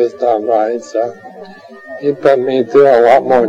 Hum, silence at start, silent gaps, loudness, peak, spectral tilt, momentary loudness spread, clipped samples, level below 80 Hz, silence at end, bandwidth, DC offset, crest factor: none; 0 s; none; -12 LUFS; 0 dBFS; -6 dB/octave; 13 LU; under 0.1%; -56 dBFS; 0 s; 8.6 kHz; under 0.1%; 12 dB